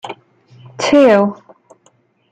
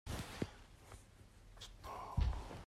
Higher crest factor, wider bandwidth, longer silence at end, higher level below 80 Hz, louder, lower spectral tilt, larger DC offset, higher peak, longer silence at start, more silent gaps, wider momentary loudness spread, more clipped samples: second, 14 dB vs 20 dB; second, 9.2 kHz vs 14.5 kHz; first, 0.95 s vs 0 s; second, -56 dBFS vs -48 dBFS; first, -12 LUFS vs -45 LUFS; about the same, -5 dB/octave vs -5.5 dB/octave; neither; first, -2 dBFS vs -24 dBFS; about the same, 0.05 s vs 0.05 s; neither; about the same, 23 LU vs 21 LU; neither